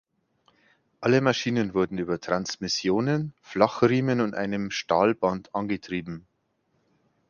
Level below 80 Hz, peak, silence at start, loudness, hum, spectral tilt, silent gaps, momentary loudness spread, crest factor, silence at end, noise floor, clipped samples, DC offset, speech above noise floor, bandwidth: -60 dBFS; -4 dBFS; 1 s; -26 LUFS; none; -5.5 dB/octave; none; 9 LU; 22 dB; 1.1 s; -72 dBFS; under 0.1%; under 0.1%; 47 dB; 7.2 kHz